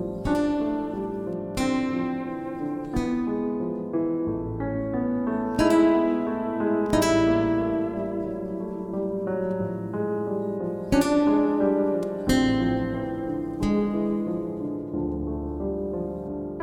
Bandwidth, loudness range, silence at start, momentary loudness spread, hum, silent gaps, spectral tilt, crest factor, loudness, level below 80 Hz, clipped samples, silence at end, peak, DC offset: 17 kHz; 5 LU; 0 s; 10 LU; none; none; -6.5 dB/octave; 16 dB; -26 LUFS; -44 dBFS; under 0.1%; 0 s; -8 dBFS; under 0.1%